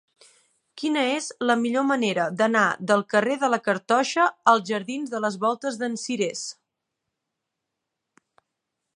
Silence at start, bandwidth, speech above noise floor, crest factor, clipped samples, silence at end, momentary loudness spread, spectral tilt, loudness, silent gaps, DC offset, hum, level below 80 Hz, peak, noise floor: 0.75 s; 11.5 kHz; 59 dB; 22 dB; under 0.1%; 2.45 s; 8 LU; -4 dB/octave; -23 LUFS; none; under 0.1%; none; -78 dBFS; -4 dBFS; -83 dBFS